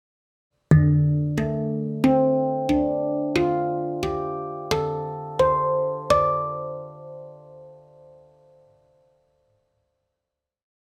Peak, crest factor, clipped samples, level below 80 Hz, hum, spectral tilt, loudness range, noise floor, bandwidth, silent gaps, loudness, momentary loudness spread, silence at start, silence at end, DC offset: -4 dBFS; 20 dB; under 0.1%; -48 dBFS; none; -8 dB/octave; 7 LU; -85 dBFS; 12 kHz; none; -23 LUFS; 13 LU; 0.7 s; 3.05 s; under 0.1%